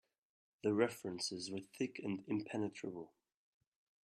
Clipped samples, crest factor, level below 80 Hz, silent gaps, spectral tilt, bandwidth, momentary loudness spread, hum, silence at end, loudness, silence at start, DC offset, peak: under 0.1%; 24 dB; -84 dBFS; none; -4.5 dB/octave; 13.5 kHz; 12 LU; none; 0.95 s; -41 LUFS; 0.65 s; under 0.1%; -18 dBFS